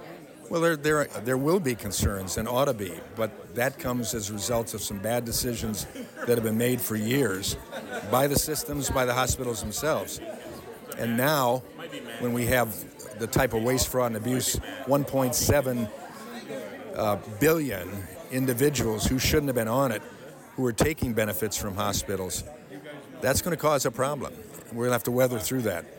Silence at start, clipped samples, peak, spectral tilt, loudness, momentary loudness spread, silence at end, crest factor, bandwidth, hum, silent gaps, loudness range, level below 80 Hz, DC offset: 0 s; under 0.1%; -12 dBFS; -4.5 dB/octave; -27 LUFS; 14 LU; 0 s; 16 dB; 17 kHz; none; none; 3 LU; -46 dBFS; under 0.1%